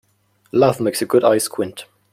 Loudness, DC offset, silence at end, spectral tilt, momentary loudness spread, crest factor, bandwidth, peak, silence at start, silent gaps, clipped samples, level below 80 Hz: -18 LUFS; under 0.1%; 0.3 s; -5 dB/octave; 12 LU; 16 dB; 16 kHz; -2 dBFS; 0.55 s; none; under 0.1%; -60 dBFS